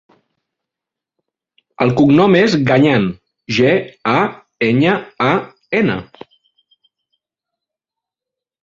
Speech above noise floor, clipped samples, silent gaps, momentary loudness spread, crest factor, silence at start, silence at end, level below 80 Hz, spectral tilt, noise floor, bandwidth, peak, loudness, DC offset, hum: 72 dB; under 0.1%; none; 10 LU; 16 dB; 1.8 s; 2.6 s; -52 dBFS; -7 dB/octave; -85 dBFS; 7.6 kHz; 0 dBFS; -15 LUFS; under 0.1%; none